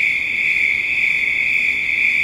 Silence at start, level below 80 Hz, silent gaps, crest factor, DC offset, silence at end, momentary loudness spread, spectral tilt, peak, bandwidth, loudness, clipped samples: 0 s; -50 dBFS; none; 14 dB; under 0.1%; 0 s; 1 LU; -1 dB/octave; -4 dBFS; 16 kHz; -15 LUFS; under 0.1%